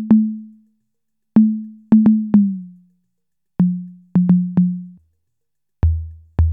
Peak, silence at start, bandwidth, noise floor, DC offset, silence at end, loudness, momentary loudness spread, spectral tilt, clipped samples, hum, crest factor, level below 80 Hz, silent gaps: -2 dBFS; 0 s; 2.6 kHz; -83 dBFS; under 0.1%; 0 s; -17 LUFS; 15 LU; -13 dB/octave; under 0.1%; none; 16 dB; -30 dBFS; none